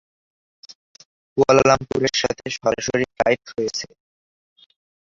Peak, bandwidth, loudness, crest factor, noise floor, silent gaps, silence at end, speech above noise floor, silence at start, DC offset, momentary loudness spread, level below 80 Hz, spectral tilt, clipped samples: -2 dBFS; 7.8 kHz; -20 LUFS; 20 dB; under -90 dBFS; 0.75-0.95 s, 1.05-1.36 s; 1.3 s; over 70 dB; 0.7 s; under 0.1%; 12 LU; -52 dBFS; -4 dB/octave; under 0.1%